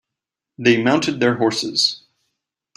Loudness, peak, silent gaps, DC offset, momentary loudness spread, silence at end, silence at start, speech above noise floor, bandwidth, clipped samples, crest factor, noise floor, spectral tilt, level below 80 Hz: -18 LUFS; -2 dBFS; none; under 0.1%; 4 LU; 0.8 s; 0.6 s; 67 dB; 13 kHz; under 0.1%; 18 dB; -84 dBFS; -4 dB/octave; -62 dBFS